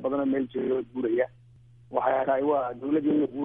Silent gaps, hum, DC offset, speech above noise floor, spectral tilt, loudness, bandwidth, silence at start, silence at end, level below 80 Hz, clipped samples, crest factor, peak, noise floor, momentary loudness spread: none; none; under 0.1%; 28 dB; -10 dB/octave; -27 LUFS; 3.7 kHz; 0 s; 0 s; -64 dBFS; under 0.1%; 16 dB; -10 dBFS; -54 dBFS; 4 LU